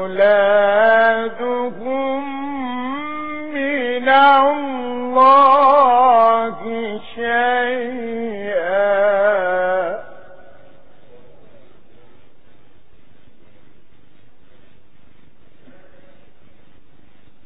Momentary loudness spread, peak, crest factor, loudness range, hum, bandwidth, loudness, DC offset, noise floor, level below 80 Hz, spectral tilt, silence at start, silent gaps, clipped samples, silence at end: 14 LU; -2 dBFS; 16 dB; 8 LU; none; 5 kHz; -16 LUFS; 2%; -53 dBFS; -58 dBFS; -7.5 dB/octave; 0 s; none; under 0.1%; 7.35 s